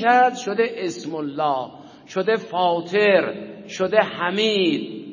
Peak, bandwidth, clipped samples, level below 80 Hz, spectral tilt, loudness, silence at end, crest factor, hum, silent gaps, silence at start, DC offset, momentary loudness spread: -2 dBFS; 7.4 kHz; under 0.1%; -70 dBFS; -4.5 dB/octave; -21 LUFS; 0 s; 20 dB; none; none; 0 s; under 0.1%; 12 LU